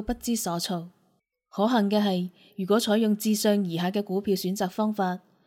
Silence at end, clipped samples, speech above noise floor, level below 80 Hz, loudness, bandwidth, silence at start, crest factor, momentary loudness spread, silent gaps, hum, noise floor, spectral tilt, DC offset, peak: 0.3 s; under 0.1%; 45 dB; -54 dBFS; -26 LUFS; 17 kHz; 0 s; 16 dB; 8 LU; none; none; -70 dBFS; -5 dB/octave; under 0.1%; -10 dBFS